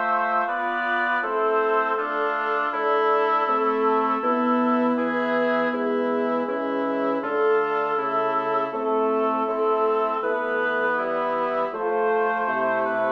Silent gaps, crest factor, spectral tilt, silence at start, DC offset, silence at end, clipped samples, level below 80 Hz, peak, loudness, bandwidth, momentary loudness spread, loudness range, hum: none; 12 dB; -6.5 dB/octave; 0 s; under 0.1%; 0 s; under 0.1%; -72 dBFS; -10 dBFS; -23 LUFS; 6 kHz; 3 LU; 2 LU; none